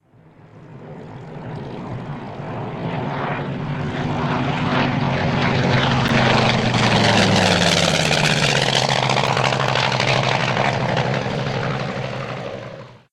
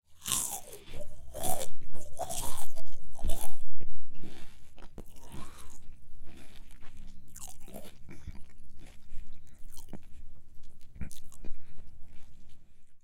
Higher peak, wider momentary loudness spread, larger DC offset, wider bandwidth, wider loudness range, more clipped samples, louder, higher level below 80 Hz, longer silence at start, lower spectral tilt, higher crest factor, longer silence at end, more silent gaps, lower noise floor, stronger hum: first, -2 dBFS vs -8 dBFS; second, 16 LU vs 22 LU; neither; second, 13.5 kHz vs 16.5 kHz; about the same, 12 LU vs 13 LU; neither; first, -18 LUFS vs -40 LUFS; about the same, -44 dBFS vs -42 dBFS; first, 0.55 s vs 0.25 s; first, -4.5 dB/octave vs -3 dB/octave; about the same, 18 dB vs 14 dB; about the same, 0.15 s vs 0.05 s; neither; first, -48 dBFS vs -41 dBFS; neither